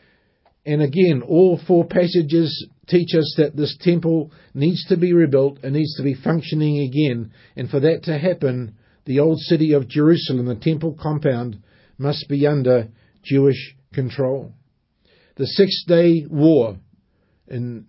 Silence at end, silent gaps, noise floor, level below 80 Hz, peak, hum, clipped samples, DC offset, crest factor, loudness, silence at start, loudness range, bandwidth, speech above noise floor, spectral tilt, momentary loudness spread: 0.05 s; none; -62 dBFS; -56 dBFS; -2 dBFS; none; under 0.1%; under 0.1%; 16 dB; -19 LUFS; 0.65 s; 3 LU; 5.8 kHz; 45 dB; -11.5 dB/octave; 13 LU